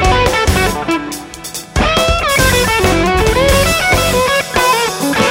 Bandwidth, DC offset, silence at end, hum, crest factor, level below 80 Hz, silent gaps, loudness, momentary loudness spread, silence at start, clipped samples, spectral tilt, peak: 16.5 kHz; under 0.1%; 0 s; none; 12 dB; -22 dBFS; none; -12 LUFS; 8 LU; 0 s; under 0.1%; -3.5 dB/octave; 0 dBFS